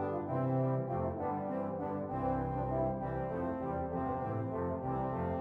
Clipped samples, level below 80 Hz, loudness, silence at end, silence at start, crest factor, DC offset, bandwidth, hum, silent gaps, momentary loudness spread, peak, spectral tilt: under 0.1%; -52 dBFS; -36 LUFS; 0 s; 0 s; 12 dB; under 0.1%; 3.9 kHz; none; none; 4 LU; -24 dBFS; -11 dB/octave